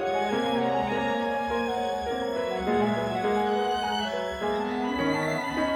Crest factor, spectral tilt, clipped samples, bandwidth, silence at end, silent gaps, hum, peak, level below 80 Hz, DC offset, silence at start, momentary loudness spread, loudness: 14 dB; -5 dB/octave; under 0.1%; 18 kHz; 0 s; none; none; -14 dBFS; -52 dBFS; under 0.1%; 0 s; 3 LU; -27 LUFS